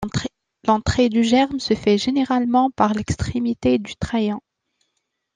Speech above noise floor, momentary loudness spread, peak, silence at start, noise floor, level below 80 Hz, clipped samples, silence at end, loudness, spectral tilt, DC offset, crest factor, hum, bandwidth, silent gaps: 56 dB; 9 LU; -2 dBFS; 0 s; -75 dBFS; -42 dBFS; under 0.1%; 0.95 s; -20 LUFS; -5.5 dB/octave; under 0.1%; 18 dB; none; 9.6 kHz; none